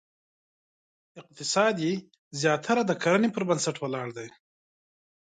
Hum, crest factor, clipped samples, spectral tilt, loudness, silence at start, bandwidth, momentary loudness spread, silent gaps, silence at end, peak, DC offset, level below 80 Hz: none; 20 dB; under 0.1%; -4.5 dB/octave; -27 LUFS; 1.15 s; 9.6 kHz; 13 LU; 2.19-2.31 s; 0.95 s; -10 dBFS; under 0.1%; -74 dBFS